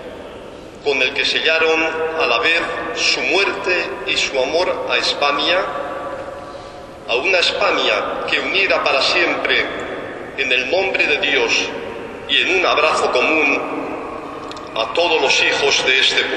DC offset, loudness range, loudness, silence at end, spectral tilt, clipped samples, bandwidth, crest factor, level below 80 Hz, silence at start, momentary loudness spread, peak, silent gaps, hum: under 0.1%; 3 LU; -16 LUFS; 0 s; -1.5 dB/octave; under 0.1%; 11 kHz; 18 dB; -50 dBFS; 0 s; 15 LU; 0 dBFS; none; none